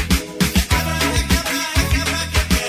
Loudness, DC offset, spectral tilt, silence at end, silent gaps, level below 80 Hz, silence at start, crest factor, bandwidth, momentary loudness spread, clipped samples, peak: -18 LUFS; under 0.1%; -3.5 dB/octave; 0 s; none; -22 dBFS; 0 s; 16 dB; 16 kHz; 2 LU; under 0.1%; -2 dBFS